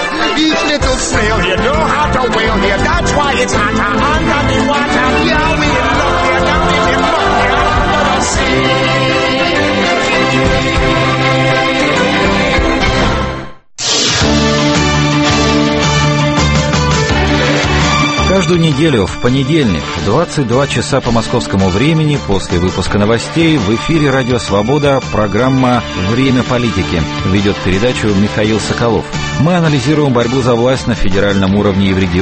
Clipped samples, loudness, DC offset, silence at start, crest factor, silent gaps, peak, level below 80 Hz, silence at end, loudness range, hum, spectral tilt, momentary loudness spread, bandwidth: under 0.1%; -11 LUFS; under 0.1%; 0 s; 12 dB; none; 0 dBFS; -24 dBFS; 0 s; 2 LU; none; -5 dB/octave; 3 LU; 8.8 kHz